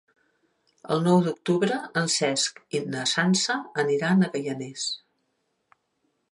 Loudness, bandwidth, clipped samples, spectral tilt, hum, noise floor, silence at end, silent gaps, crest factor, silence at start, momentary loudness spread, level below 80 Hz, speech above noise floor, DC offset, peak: -25 LUFS; 11.5 kHz; under 0.1%; -4 dB/octave; none; -75 dBFS; 1.35 s; none; 20 dB; 0.85 s; 9 LU; -74 dBFS; 50 dB; under 0.1%; -8 dBFS